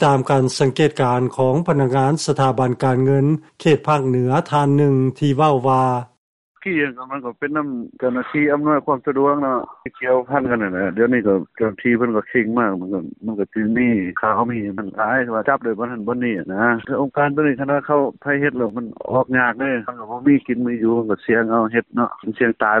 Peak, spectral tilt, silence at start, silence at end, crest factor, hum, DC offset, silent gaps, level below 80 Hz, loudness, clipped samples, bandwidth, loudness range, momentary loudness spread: -4 dBFS; -7 dB/octave; 0 s; 0 s; 14 dB; none; under 0.1%; 6.18-6.55 s; -56 dBFS; -19 LUFS; under 0.1%; 11.5 kHz; 3 LU; 8 LU